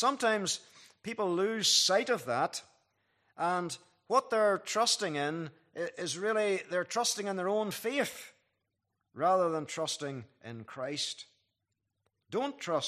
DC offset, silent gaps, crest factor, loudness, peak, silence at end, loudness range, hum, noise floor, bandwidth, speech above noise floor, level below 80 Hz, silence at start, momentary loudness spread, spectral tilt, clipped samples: under 0.1%; none; 20 dB; -31 LUFS; -14 dBFS; 0 s; 5 LU; none; -84 dBFS; 15 kHz; 52 dB; -84 dBFS; 0 s; 14 LU; -2.5 dB/octave; under 0.1%